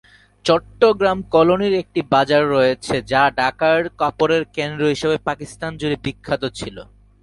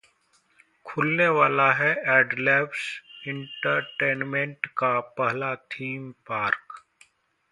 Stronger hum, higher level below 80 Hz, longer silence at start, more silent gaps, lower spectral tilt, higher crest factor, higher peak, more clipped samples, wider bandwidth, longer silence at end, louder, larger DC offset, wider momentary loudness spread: neither; first, -48 dBFS vs -72 dBFS; second, 0.45 s vs 0.85 s; neither; about the same, -5.5 dB/octave vs -6 dB/octave; about the same, 18 dB vs 22 dB; first, 0 dBFS vs -4 dBFS; neither; about the same, 11.5 kHz vs 11.5 kHz; second, 0.4 s vs 0.75 s; first, -18 LUFS vs -24 LUFS; neither; second, 10 LU vs 14 LU